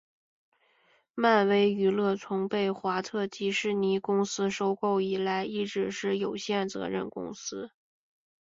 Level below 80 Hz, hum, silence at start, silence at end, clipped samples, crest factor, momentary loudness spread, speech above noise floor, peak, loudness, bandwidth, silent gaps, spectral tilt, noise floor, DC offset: -72 dBFS; none; 1.15 s; 0.75 s; under 0.1%; 20 dB; 12 LU; 39 dB; -10 dBFS; -29 LUFS; 7.8 kHz; none; -5 dB/octave; -67 dBFS; under 0.1%